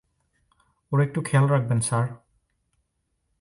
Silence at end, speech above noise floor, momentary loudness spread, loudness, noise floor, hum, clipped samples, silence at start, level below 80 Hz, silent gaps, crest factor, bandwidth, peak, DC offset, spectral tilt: 1.25 s; 53 dB; 6 LU; -24 LUFS; -75 dBFS; none; under 0.1%; 0.9 s; -62 dBFS; none; 18 dB; 11.5 kHz; -8 dBFS; under 0.1%; -6.5 dB/octave